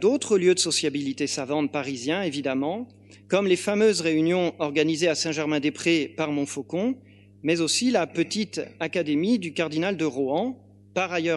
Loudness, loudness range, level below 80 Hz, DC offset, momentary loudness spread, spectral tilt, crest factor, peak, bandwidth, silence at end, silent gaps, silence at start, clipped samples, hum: -25 LUFS; 3 LU; -72 dBFS; under 0.1%; 8 LU; -4 dB/octave; 18 dB; -8 dBFS; 12 kHz; 0 s; none; 0 s; under 0.1%; 50 Hz at -50 dBFS